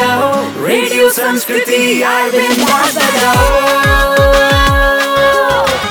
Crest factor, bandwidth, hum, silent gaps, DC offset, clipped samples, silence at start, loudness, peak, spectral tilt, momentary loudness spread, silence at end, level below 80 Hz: 10 dB; over 20 kHz; none; none; under 0.1%; under 0.1%; 0 s; -10 LUFS; 0 dBFS; -3.5 dB/octave; 4 LU; 0 s; -22 dBFS